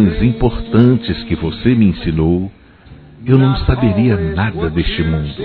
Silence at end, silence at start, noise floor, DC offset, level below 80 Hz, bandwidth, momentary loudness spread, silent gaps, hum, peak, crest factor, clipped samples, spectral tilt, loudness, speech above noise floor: 0 s; 0 s; -40 dBFS; under 0.1%; -26 dBFS; 4.5 kHz; 7 LU; none; none; 0 dBFS; 14 dB; 0.1%; -11 dB/octave; -15 LUFS; 26 dB